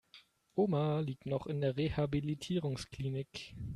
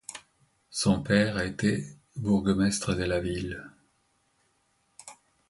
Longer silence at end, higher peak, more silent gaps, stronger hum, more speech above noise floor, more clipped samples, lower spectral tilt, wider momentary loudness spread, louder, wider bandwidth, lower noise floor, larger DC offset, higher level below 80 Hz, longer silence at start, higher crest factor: second, 0 s vs 0.35 s; second, -20 dBFS vs -8 dBFS; neither; neither; second, 28 dB vs 44 dB; neither; first, -7 dB/octave vs -5 dB/octave; second, 8 LU vs 23 LU; second, -36 LUFS vs -28 LUFS; about the same, 12 kHz vs 11.5 kHz; second, -63 dBFS vs -71 dBFS; neither; second, -58 dBFS vs -50 dBFS; about the same, 0.15 s vs 0.1 s; about the same, 16 dB vs 20 dB